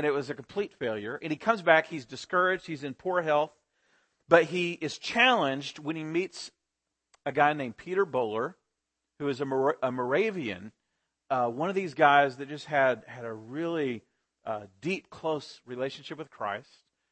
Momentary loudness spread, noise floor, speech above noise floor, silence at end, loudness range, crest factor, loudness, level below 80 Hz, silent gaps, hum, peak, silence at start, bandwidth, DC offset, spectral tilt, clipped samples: 15 LU; -85 dBFS; 56 dB; 0.5 s; 5 LU; 24 dB; -29 LUFS; -74 dBFS; none; none; -6 dBFS; 0 s; 8.8 kHz; under 0.1%; -5 dB/octave; under 0.1%